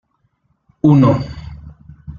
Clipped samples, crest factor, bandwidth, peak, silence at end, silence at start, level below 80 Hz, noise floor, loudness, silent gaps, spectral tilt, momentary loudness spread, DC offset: under 0.1%; 16 dB; 7 kHz; -2 dBFS; 0 s; 0.85 s; -40 dBFS; -63 dBFS; -13 LUFS; none; -10 dB/octave; 22 LU; under 0.1%